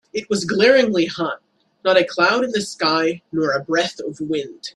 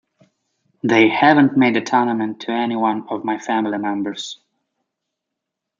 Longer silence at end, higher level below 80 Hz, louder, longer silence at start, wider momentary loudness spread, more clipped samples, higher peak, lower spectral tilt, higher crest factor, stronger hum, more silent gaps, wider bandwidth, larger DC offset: second, 0.05 s vs 1.45 s; first, -62 dBFS vs -68 dBFS; about the same, -19 LUFS vs -18 LUFS; second, 0.15 s vs 0.85 s; about the same, 11 LU vs 13 LU; neither; about the same, -2 dBFS vs 0 dBFS; second, -4 dB/octave vs -5.5 dB/octave; about the same, 18 dB vs 18 dB; neither; neither; first, 12 kHz vs 7.6 kHz; neither